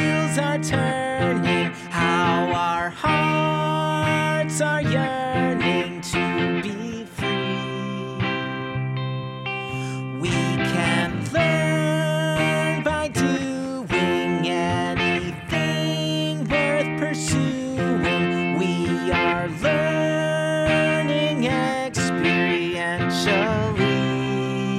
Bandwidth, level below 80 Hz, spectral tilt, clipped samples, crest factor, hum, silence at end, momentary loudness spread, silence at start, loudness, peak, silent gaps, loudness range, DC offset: 14 kHz; -48 dBFS; -5.5 dB/octave; under 0.1%; 16 dB; none; 0 s; 7 LU; 0 s; -22 LUFS; -8 dBFS; none; 4 LU; under 0.1%